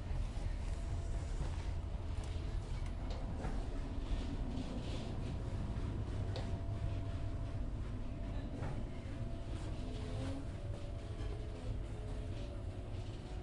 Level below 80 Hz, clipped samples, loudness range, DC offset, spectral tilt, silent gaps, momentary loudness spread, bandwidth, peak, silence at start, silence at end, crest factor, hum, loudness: -44 dBFS; under 0.1%; 2 LU; under 0.1%; -7 dB/octave; none; 4 LU; 11 kHz; -28 dBFS; 0 s; 0 s; 12 dB; none; -44 LUFS